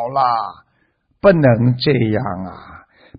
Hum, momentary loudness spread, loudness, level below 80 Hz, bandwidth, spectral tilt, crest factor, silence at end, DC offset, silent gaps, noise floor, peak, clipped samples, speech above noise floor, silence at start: none; 16 LU; -16 LUFS; -46 dBFS; 5.2 kHz; -12.5 dB/octave; 16 dB; 0.4 s; under 0.1%; none; -63 dBFS; 0 dBFS; under 0.1%; 47 dB; 0 s